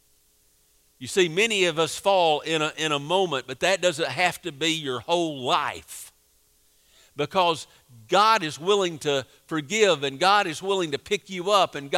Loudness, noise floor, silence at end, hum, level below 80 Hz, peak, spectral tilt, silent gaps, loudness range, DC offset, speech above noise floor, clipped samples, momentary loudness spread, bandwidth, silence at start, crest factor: -23 LUFS; -63 dBFS; 0 s; none; -66 dBFS; -6 dBFS; -3 dB/octave; none; 5 LU; under 0.1%; 39 dB; under 0.1%; 11 LU; 16 kHz; 1 s; 20 dB